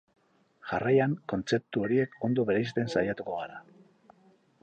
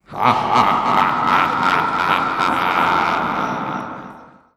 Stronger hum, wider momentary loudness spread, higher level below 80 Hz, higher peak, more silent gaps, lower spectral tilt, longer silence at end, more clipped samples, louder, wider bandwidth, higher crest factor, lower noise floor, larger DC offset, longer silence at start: neither; about the same, 11 LU vs 9 LU; second, -64 dBFS vs -50 dBFS; second, -12 dBFS vs 0 dBFS; neither; first, -7 dB/octave vs -4.5 dB/octave; first, 1 s vs 0.3 s; neither; second, -29 LUFS vs -17 LUFS; second, 8.8 kHz vs 15.5 kHz; about the same, 18 dB vs 18 dB; first, -63 dBFS vs -40 dBFS; neither; first, 0.65 s vs 0.1 s